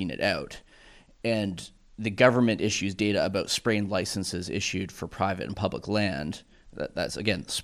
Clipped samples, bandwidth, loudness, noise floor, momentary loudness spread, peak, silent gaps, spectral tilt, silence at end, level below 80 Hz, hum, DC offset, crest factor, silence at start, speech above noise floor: under 0.1%; 15 kHz; -28 LUFS; -54 dBFS; 14 LU; -6 dBFS; none; -4.5 dB/octave; 0 s; -54 dBFS; none; under 0.1%; 22 dB; 0 s; 26 dB